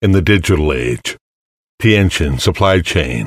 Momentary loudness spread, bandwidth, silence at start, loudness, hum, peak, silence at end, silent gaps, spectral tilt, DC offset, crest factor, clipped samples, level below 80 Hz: 9 LU; 15.5 kHz; 0 s; -14 LUFS; none; 0 dBFS; 0 s; 1.21-1.78 s; -5.5 dB/octave; under 0.1%; 14 dB; under 0.1%; -28 dBFS